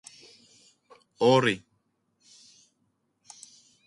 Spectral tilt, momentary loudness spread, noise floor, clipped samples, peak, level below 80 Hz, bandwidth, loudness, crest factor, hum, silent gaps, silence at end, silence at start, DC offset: -5 dB/octave; 27 LU; -74 dBFS; under 0.1%; -8 dBFS; -74 dBFS; 11.5 kHz; -24 LUFS; 22 dB; none; none; 2.3 s; 1.2 s; under 0.1%